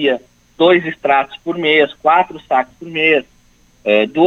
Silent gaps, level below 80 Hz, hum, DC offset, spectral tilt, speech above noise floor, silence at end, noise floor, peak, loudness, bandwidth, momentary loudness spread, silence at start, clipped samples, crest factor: none; -56 dBFS; 60 Hz at -50 dBFS; under 0.1%; -6 dB/octave; 37 dB; 0 s; -51 dBFS; 0 dBFS; -15 LUFS; 7.8 kHz; 9 LU; 0 s; under 0.1%; 16 dB